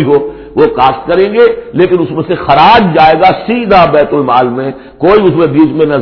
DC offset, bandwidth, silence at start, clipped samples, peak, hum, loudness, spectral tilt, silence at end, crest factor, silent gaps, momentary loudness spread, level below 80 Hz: under 0.1%; 5.4 kHz; 0 s; 3%; 0 dBFS; none; -8 LUFS; -8.5 dB/octave; 0 s; 8 dB; none; 8 LU; -36 dBFS